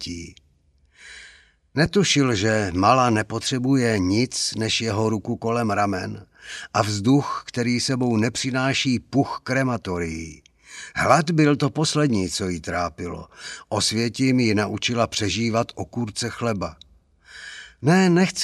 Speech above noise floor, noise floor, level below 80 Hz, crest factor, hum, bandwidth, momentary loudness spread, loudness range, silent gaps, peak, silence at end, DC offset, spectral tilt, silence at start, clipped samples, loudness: 39 dB; -61 dBFS; -52 dBFS; 22 dB; none; 13.5 kHz; 18 LU; 3 LU; none; 0 dBFS; 0 s; under 0.1%; -5 dB/octave; 0 s; under 0.1%; -22 LUFS